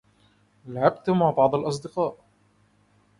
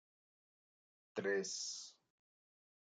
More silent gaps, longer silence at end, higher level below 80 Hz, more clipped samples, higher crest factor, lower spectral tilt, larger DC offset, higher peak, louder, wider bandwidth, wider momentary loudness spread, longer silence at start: neither; first, 1.05 s vs 0.9 s; first, -62 dBFS vs under -90 dBFS; neither; about the same, 22 dB vs 20 dB; first, -7 dB/octave vs -2 dB/octave; neither; first, -4 dBFS vs -26 dBFS; first, -24 LUFS vs -42 LUFS; first, 11.5 kHz vs 9.6 kHz; about the same, 9 LU vs 10 LU; second, 0.65 s vs 1.15 s